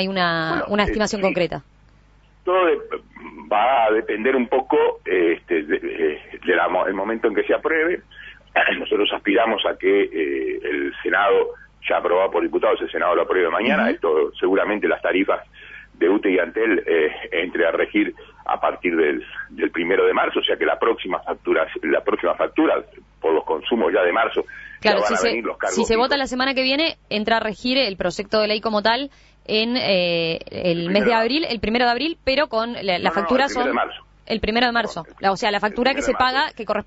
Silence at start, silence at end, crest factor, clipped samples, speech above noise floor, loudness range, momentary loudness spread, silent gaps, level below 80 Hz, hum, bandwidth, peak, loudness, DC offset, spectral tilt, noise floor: 0 s; 0.05 s; 18 dB; under 0.1%; 32 dB; 2 LU; 7 LU; none; -48 dBFS; 50 Hz at -55 dBFS; 8 kHz; -4 dBFS; -20 LUFS; under 0.1%; -4.5 dB/octave; -53 dBFS